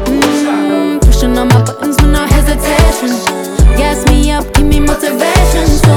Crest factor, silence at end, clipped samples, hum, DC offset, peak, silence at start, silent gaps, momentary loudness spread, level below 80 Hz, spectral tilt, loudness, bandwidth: 8 dB; 0 s; 0.2%; none; under 0.1%; 0 dBFS; 0 s; none; 3 LU; -12 dBFS; -5.5 dB/octave; -11 LUFS; 17.5 kHz